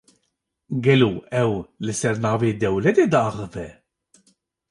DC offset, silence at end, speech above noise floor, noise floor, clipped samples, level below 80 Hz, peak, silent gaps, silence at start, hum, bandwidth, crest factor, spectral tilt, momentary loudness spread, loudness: under 0.1%; 1 s; 55 dB; -75 dBFS; under 0.1%; -52 dBFS; -4 dBFS; none; 0.7 s; none; 11.5 kHz; 18 dB; -6 dB/octave; 14 LU; -21 LUFS